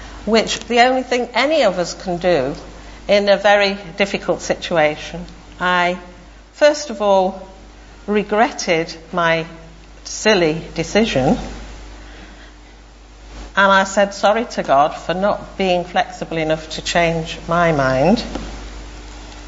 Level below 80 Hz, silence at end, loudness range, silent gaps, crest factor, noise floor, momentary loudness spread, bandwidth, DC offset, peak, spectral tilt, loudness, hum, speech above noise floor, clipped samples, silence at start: -38 dBFS; 0 s; 3 LU; none; 18 dB; -41 dBFS; 20 LU; 8 kHz; under 0.1%; 0 dBFS; -4.5 dB/octave; -17 LUFS; none; 24 dB; under 0.1%; 0 s